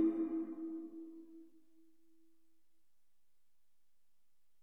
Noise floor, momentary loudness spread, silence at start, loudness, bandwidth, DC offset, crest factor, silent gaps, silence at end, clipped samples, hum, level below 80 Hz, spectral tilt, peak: -87 dBFS; 21 LU; 0 s; -42 LUFS; 2.6 kHz; under 0.1%; 20 dB; none; 3.15 s; under 0.1%; none; -86 dBFS; -8.5 dB/octave; -24 dBFS